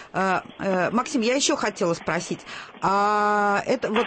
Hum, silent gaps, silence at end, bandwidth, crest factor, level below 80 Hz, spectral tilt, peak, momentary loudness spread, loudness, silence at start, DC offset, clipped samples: none; none; 0 s; 8.8 kHz; 16 dB; -60 dBFS; -3.5 dB/octave; -8 dBFS; 7 LU; -23 LUFS; 0 s; under 0.1%; under 0.1%